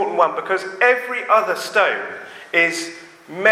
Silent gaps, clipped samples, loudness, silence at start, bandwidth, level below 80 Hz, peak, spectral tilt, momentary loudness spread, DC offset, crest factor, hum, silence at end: none; under 0.1%; -18 LUFS; 0 s; 15.5 kHz; -76 dBFS; 0 dBFS; -2.5 dB/octave; 15 LU; under 0.1%; 18 dB; none; 0 s